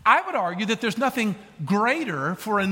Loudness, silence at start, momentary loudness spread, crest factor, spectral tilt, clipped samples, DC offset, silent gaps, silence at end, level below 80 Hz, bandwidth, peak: -24 LUFS; 0.05 s; 7 LU; 20 dB; -5 dB/octave; under 0.1%; under 0.1%; none; 0 s; -64 dBFS; 17 kHz; -2 dBFS